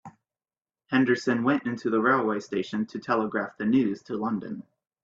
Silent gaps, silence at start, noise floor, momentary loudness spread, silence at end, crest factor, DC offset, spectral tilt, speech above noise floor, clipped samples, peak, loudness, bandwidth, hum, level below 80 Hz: none; 0.05 s; under -90 dBFS; 8 LU; 0.45 s; 18 dB; under 0.1%; -6.5 dB/octave; over 64 dB; under 0.1%; -8 dBFS; -26 LUFS; 7.6 kHz; none; -70 dBFS